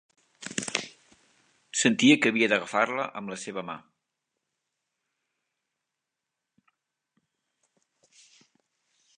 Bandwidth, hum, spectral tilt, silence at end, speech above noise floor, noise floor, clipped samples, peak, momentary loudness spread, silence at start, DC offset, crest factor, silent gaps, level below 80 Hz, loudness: 10.5 kHz; none; -3 dB/octave; 5.4 s; 61 dB; -86 dBFS; under 0.1%; -6 dBFS; 20 LU; 0.4 s; under 0.1%; 26 dB; none; -78 dBFS; -26 LUFS